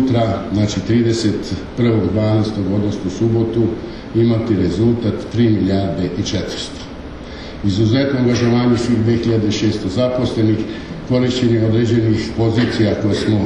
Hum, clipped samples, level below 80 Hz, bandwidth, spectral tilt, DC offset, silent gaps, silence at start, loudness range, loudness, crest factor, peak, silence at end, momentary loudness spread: none; under 0.1%; -38 dBFS; 9.6 kHz; -7 dB/octave; under 0.1%; none; 0 s; 2 LU; -17 LUFS; 12 dB; -4 dBFS; 0 s; 8 LU